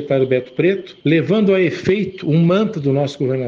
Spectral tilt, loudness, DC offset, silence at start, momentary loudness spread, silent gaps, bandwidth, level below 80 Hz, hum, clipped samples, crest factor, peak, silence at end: -8 dB/octave; -17 LUFS; under 0.1%; 0 s; 4 LU; none; 7.4 kHz; -56 dBFS; none; under 0.1%; 14 dB; -2 dBFS; 0 s